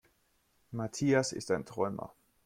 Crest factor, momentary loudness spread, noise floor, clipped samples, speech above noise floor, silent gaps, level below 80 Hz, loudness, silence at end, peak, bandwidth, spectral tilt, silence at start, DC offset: 18 dB; 15 LU; -73 dBFS; under 0.1%; 40 dB; none; -68 dBFS; -33 LUFS; 0.4 s; -16 dBFS; 15.5 kHz; -5 dB/octave; 0.7 s; under 0.1%